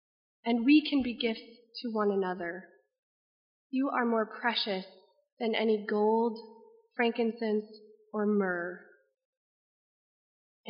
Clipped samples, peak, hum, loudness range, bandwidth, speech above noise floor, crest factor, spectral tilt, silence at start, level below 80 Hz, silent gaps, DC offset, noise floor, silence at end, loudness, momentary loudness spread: under 0.1%; -14 dBFS; none; 3 LU; 5.4 kHz; over 60 dB; 18 dB; -3 dB/octave; 0.45 s; -72 dBFS; 2.99-3.70 s, 5.32-5.37 s, 9.25-10.64 s; under 0.1%; under -90 dBFS; 0 s; -31 LUFS; 15 LU